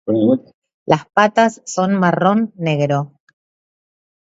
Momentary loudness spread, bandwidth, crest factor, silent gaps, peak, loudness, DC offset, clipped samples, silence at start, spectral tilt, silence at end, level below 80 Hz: 7 LU; 8 kHz; 18 dB; 0.54-0.62 s, 0.74-0.86 s; 0 dBFS; -16 LUFS; under 0.1%; under 0.1%; 0.05 s; -6 dB/octave; 1.15 s; -62 dBFS